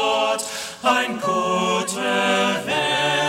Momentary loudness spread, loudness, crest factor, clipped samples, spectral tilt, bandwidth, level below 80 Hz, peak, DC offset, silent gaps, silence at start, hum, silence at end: 4 LU; -20 LUFS; 16 dB; under 0.1%; -3 dB/octave; 16.5 kHz; -60 dBFS; -6 dBFS; under 0.1%; none; 0 s; none; 0 s